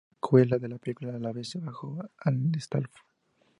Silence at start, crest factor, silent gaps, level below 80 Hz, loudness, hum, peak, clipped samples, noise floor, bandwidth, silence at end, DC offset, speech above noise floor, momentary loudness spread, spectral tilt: 0.25 s; 22 dB; none; -70 dBFS; -29 LUFS; none; -8 dBFS; under 0.1%; -70 dBFS; 11 kHz; 0.7 s; under 0.1%; 41 dB; 15 LU; -8 dB/octave